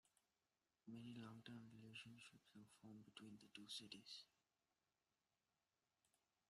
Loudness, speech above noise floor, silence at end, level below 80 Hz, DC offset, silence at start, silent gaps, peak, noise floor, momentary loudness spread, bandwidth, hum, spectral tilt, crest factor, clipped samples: -60 LUFS; over 28 dB; 0.4 s; under -90 dBFS; under 0.1%; 0.05 s; none; -42 dBFS; under -90 dBFS; 10 LU; 13 kHz; none; -4 dB/octave; 22 dB; under 0.1%